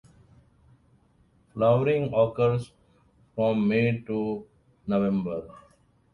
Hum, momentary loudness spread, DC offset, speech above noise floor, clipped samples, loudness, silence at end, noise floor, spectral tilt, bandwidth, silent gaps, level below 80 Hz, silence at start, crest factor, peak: none; 17 LU; under 0.1%; 38 dB; under 0.1%; -26 LUFS; 0.55 s; -63 dBFS; -9 dB/octave; 11 kHz; none; -58 dBFS; 1.55 s; 18 dB; -10 dBFS